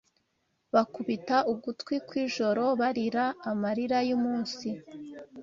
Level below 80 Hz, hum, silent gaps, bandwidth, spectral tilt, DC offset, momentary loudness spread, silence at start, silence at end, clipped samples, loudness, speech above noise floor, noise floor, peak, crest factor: -72 dBFS; none; none; 7.6 kHz; -5.5 dB/octave; under 0.1%; 10 LU; 0.75 s; 0 s; under 0.1%; -29 LUFS; 47 dB; -76 dBFS; -10 dBFS; 20 dB